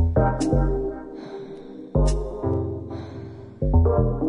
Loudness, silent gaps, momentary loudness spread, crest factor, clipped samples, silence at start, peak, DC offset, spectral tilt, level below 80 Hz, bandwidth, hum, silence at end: -24 LUFS; none; 17 LU; 16 dB; under 0.1%; 0 s; -6 dBFS; under 0.1%; -8 dB/octave; -28 dBFS; 10.5 kHz; none; 0 s